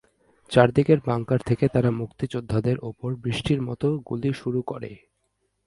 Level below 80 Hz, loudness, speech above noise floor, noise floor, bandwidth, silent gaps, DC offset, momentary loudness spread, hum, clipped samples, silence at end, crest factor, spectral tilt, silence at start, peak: -50 dBFS; -24 LUFS; 50 dB; -73 dBFS; 11.5 kHz; none; under 0.1%; 11 LU; none; under 0.1%; 0.7 s; 22 dB; -7.5 dB/octave; 0.5 s; -2 dBFS